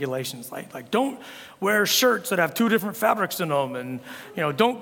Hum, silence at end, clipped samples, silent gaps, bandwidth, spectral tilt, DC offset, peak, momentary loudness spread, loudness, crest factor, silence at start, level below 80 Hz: none; 0 s; under 0.1%; none; 18 kHz; -3.5 dB/octave; under 0.1%; -4 dBFS; 16 LU; -23 LUFS; 20 dB; 0 s; -72 dBFS